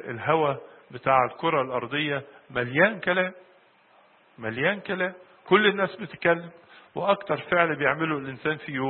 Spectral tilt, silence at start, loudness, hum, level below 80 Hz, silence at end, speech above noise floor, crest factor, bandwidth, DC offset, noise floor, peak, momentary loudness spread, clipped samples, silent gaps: -10 dB/octave; 0 s; -25 LUFS; none; -66 dBFS; 0 s; 33 dB; 22 dB; 4.4 kHz; under 0.1%; -59 dBFS; -4 dBFS; 11 LU; under 0.1%; none